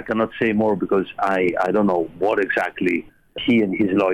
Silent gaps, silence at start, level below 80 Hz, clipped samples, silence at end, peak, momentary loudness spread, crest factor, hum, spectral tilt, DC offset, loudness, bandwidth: none; 0 s; -54 dBFS; under 0.1%; 0 s; -6 dBFS; 4 LU; 14 dB; none; -7 dB/octave; 0.2%; -20 LUFS; 11.5 kHz